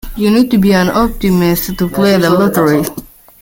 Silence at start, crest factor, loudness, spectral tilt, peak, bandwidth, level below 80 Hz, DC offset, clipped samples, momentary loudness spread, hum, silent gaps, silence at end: 0.05 s; 12 dB; -12 LUFS; -6 dB/octave; 0 dBFS; 17 kHz; -32 dBFS; under 0.1%; under 0.1%; 6 LU; none; none; 0.35 s